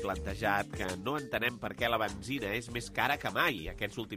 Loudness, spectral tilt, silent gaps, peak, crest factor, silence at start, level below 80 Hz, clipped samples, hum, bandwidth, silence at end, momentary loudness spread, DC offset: -33 LUFS; -4.5 dB/octave; none; -14 dBFS; 20 dB; 0 s; -50 dBFS; under 0.1%; none; 15.5 kHz; 0 s; 6 LU; under 0.1%